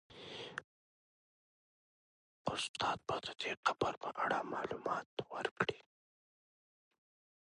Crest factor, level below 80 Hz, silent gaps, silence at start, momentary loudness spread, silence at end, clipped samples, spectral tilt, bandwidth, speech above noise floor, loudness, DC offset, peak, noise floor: 26 dB; -74 dBFS; 0.64-2.45 s, 2.69-2.74 s, 3.57-3.63 s, 3.97-4.01 s, 5.06-5.17 s, 5.51-5.56 s; 0.1 s; 11 LU; 1.65 s; under 0.1%; -3.5 dB/octave; 11 kHz; over 51 dB; -40 LUFS; under 0.1%; -18 dBFS; under -90 dBFS